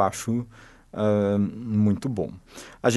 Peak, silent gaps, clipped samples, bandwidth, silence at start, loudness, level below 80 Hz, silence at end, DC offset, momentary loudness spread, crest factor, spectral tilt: -6 dBFS; none; under 0.1%; 12 kHz; 0 s; -25 LUFS; -56 dBFS; 0 s; under 0.1%; 18 LU; 18 dB; -6.5 dB/octave